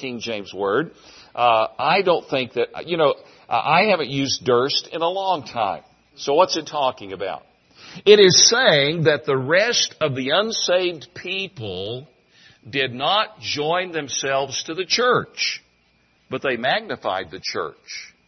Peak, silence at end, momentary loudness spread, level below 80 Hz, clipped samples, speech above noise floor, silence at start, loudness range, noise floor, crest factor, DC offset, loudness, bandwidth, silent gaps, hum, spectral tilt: 0 dBFS; 0.2 s; 14 LU; -64 dBFS; under 0.1%; 41 dB; 0 s; 8 LU; -61 dBFS; 20 dB; under 0.1%; -20 LUFS; 6.4 kHz; none; none; -2.5 dB/octave